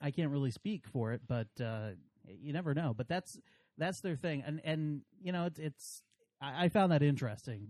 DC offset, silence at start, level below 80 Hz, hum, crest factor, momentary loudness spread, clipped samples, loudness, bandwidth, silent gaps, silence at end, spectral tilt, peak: under 0.1%; 0 s; -72 dBFS; none; 20 dB; 16 LU; under 0.1%; -37 LUFS; 13 kHz; none; 0 s; -6.5 dB/octave; -18 dBFS